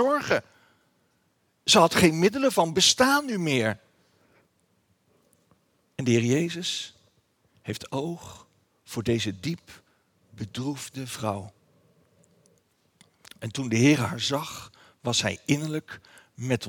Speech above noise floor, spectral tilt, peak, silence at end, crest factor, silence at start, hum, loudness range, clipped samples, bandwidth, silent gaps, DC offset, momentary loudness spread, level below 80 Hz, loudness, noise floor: 45 dB; -4 dB/octave; -2 dBFS; 0 s; 24 dB; 0 s; none; 14 LU; under 0.1%; 20 kHz; none; under 0.1%; 20 LU; -64 dBFS; -25 LUFS; -70 dBFS